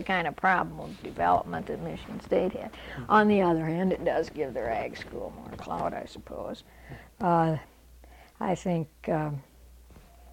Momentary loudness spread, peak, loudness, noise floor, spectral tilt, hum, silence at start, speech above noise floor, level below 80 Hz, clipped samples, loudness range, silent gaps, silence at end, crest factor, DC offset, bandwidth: 16 LU; -8 dBFS; -29 LUFS; -52 dBFS; -7 dB/octave; none; 0 s; 24 dB; -52 dBFS; under 0.1%; 5 LU; none; 0 s; 20 dB; under 0.1%; 16.5 kHz